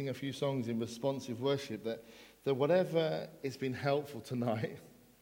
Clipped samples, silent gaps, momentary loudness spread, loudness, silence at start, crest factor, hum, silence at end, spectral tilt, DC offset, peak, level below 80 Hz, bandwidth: under 0.1%; none; 12 LU; -36 LUFS; 0 s; 18 dB; none; 0.3 s; -6.5 dB/octave; under 0.1%; -18 dBFS; -74 dBFS; 17.5 kHz